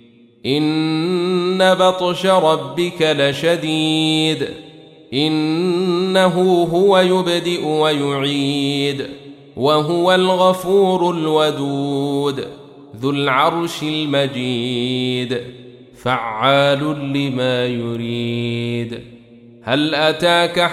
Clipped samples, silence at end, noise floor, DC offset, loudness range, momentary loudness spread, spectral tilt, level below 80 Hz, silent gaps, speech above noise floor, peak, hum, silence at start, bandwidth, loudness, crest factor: under 0.1%; 0 s; -43 dBFS; under 0.1%; 4 LU; 9 LU; -5.5 dB/octave; -58 dBFS; none; 26 dB; -2 dBFS; none; 0.45 s; 14.5 kHz; -17 LUFS; 16 dB